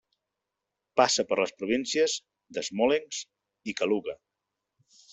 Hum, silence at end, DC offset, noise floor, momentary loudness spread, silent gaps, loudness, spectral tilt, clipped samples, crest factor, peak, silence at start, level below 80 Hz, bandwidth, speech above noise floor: none; 1 s; under 0.1%; -86 dBFS; 16 LU; none; -28 LUFS; -2.5 dB/octave; under 0.1%; 24 dB; -6 dBFS; 0.95 s; -70 dBFS; 8.2 kHz; 59 dB